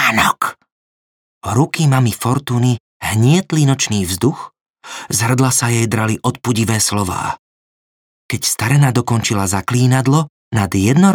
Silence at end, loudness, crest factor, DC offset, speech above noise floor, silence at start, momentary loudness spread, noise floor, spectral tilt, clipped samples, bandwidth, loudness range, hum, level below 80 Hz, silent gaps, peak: 0 s; -15 LUFS; 14 dB; under 0.1%; over 75 dB; 0 s; 9 LU; under -90 dBFS; -5 dB/octave; under 0.1%; over 20 kHz; 2 LU; none; -50 dBFS; 0.72-1.41 s, 2.80-3.00 s, 4.61-4.74 s, 7.39-8.29 s, 10.30-10.51 s; -2 dBFS